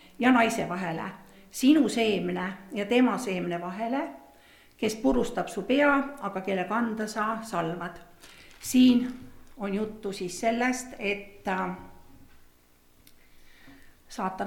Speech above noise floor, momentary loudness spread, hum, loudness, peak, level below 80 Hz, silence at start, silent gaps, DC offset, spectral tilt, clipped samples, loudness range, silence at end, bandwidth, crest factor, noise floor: 33 dB; 14 LU; none; -27 LUFS; -8 dBFS; -54 dBFS; 0.2 s; none; under 0.1%; -5 dB/octave; under 0.1%; 6 LU; 0 s; 16.5 kHz; 20 dB; -60 dBFS